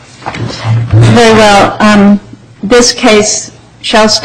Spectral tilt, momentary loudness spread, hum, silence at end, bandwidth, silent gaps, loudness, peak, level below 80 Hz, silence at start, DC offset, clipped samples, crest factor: -4.5 dB/octave; 15 LU; none; 0 s; 12 kHz; none; -6 LUFS; 0 dBFS; -30 dBFS; 0.2 s; under 0.1%; 0.5%; 6 dB